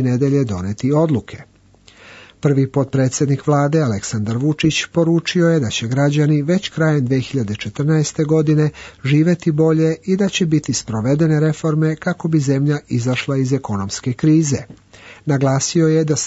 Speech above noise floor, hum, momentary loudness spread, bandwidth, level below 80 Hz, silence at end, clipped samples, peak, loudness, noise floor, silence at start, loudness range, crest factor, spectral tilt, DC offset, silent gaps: 32 dB; none; 7 LU; 8 kHz; -52 dBFS; 0 s; under 0.1%; -4 dBFS; -17 LUFS; -48 dBFS; 0 s; 2 LU; 14 dB; -6 dB/octave; under 0.1%; none